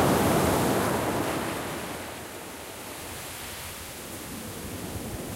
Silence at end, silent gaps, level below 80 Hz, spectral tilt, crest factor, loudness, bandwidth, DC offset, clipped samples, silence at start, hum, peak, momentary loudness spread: 0 s; none; -48 dBFS; -4.5 dB/octave; 18 dB; -30 LUFS; 16 kHz; under 0.1%; under 0.1%; 0 s; none; -12 dBFS; 15 LU